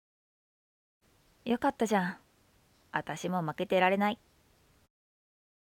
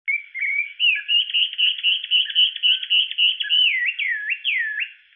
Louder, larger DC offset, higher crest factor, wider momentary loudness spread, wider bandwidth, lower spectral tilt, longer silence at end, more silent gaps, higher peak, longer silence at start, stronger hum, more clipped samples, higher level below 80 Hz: second, -31 LUFS vs -18 LUFS; neither; first, 22 dB vs 14 dB; first, 13 LU vs 7 LU; first, 17.5 kHz vs 3.8 kHz; first, -5.5 dB/octave vs 6.5 dB/octave; first, 1.65 s vs 0.2 s; neither; second, -12 dBFS vs -8 dBFS; first, 1.45 s vs 0.05 s; neither; neither; first, -70 dBFS vs under -90 dBFS